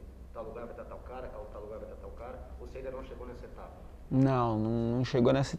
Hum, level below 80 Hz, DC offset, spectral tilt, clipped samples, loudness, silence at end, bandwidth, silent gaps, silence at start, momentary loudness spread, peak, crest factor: none; -48 dBFS; under 0.1%; -7.5 dB/octave; under 0.1%; -32 LUFS; 0 s; 9.4 kHz; none; 0 s; 20 LU; -14 dBFS; 18 dB